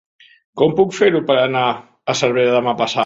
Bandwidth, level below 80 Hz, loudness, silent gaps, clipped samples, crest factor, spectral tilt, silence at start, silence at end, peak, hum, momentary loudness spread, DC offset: 8 kHz; -58 dBFS; -16 LUFS; none; under 0.1%; 16 dB; -4.5 dB/octave; 0.55 s; 0 s; 0 dBFS; none; 7 LU; under 0.1%